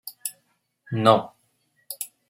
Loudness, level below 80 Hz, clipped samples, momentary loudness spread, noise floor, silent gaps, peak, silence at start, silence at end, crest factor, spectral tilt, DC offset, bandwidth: -24 LUFS; -68 dBFS; under 0.1%; 19 LU; -70 dBFS; none; -2 dBFS; 0.05 s; 0.25 s; 24 dB; -5 dB/octave; under 0.1%; 16.5 kHz